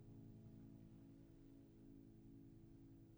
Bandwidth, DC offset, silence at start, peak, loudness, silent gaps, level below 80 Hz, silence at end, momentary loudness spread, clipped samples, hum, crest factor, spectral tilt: over 20 kHz; under 0.1%; 0 s; -50 dBFS; -64 LUFS; none; -72 dBFS; 0 s; 3 LU; under 0.1%; none; 12 dB; -8.5 dB/octave